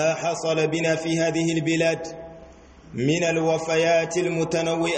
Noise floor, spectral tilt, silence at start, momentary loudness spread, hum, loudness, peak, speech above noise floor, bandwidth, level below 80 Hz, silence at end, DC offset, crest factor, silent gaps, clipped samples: -47 dBFS; -5 dB/octave; 0 s; 9 LU; none; -23 LUFS; -10 dBFS; 24 dB; 8.8 kHz; -56 dBFS; 0 s; under 0.1%; 12 dB; none; under 0.1%